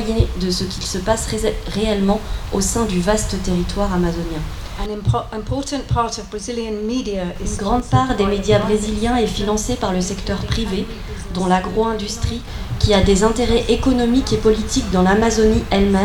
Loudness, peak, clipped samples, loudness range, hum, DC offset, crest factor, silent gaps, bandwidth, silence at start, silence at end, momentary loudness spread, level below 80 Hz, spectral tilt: -19 LUFS; -2 dBFS; under 0.1%; 6 LU; none; under 0.1%; 16 dB; none; 18.5 kHz; 0 s; 0 s; 9 LU; -28 dBFS; -5 dB/octave